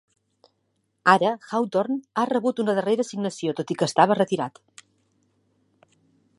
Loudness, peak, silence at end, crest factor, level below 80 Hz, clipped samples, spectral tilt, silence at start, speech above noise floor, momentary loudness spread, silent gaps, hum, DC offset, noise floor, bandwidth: -23 LUFS; -2 dBFS; 1.9 s; 24 dB; -74 dBFS; under 0.1%; -5 dB/octave; 1.05 s; 50 dB; 9 LU; none; none; under 0.1%; -73 dBFS; 11.5 kHz